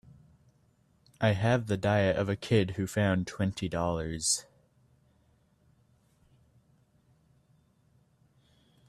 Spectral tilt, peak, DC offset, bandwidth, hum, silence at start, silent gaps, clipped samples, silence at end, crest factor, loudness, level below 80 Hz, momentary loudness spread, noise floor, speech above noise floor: -5 dB/octave; -12 dBFS; under 0.1%; 13.5 kHz; none; 1.2 s; none; under 0.1%; 4.45 s; 20 dB; -29 LUFS; -58 dBFS; 5 LU; -67 dBFS; 39 dB